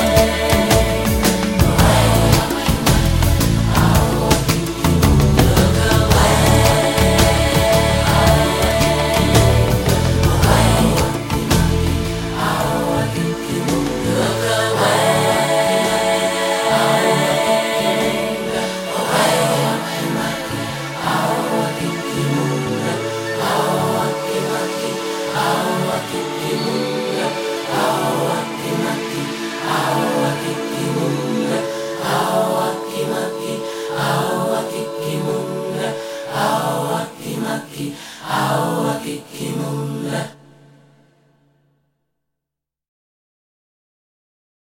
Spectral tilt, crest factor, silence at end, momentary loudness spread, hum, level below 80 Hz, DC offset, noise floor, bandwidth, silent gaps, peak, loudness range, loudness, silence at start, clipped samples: -5 dB/octave; 16 dB; 4.25 s; 10 LU; none; -28 dBFS; under 0.1%; -83 dBFS; 17 kHz; none; 0 dBFS; 8 LU; -17 LUFS; 0 s; under 0.1%